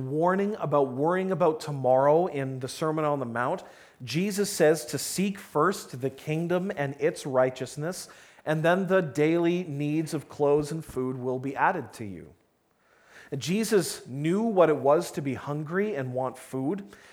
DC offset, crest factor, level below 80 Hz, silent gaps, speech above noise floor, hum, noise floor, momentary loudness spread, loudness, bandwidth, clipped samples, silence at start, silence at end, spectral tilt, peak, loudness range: under 0.1%; 20 dB; -66 dBFS; none; 41 dB; none; -68 dBFS; 11 LU; -27 LUFS; 18 kHz; under 0.1%; 0 s; 0.15 s; -5.5 dB/octave; -8 dBFS; 4 LU